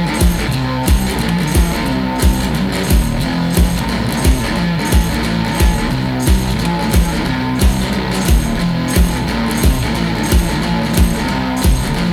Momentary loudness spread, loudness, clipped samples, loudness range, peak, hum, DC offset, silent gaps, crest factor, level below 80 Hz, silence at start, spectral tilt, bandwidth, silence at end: 3 LU; -15 LUFS; under 0.1%; 0 LU; -2 dBFS; none; under 0.1%; none; 12 dB; -18 dBFS; 0 s; -5 dB/octave; 18.5 kHz; 0 s